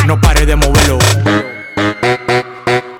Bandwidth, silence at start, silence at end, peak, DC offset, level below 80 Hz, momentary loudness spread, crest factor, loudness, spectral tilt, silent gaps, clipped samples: 19 kHz; 0 s; 0 s; -2 dBFS; under 0.1%; -18 dBFS; 7 LU; 10 dB; -12 LUFS; -4.5 dB/octave; none; under 0.1%